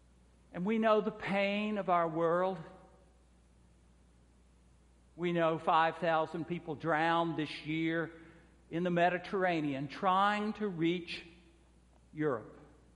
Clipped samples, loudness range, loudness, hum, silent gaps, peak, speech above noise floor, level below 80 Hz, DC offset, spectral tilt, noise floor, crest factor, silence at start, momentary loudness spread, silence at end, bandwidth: under 0.1%; 4 LU; -33 LUFS; none; none; -16 dBFS; 31 dB; -66 dBFS; under 0.1%; -7 dB/octave; -64 dBFS; 18 dB; 0.55 s; 11 LU; 0.3 s; 11 kHz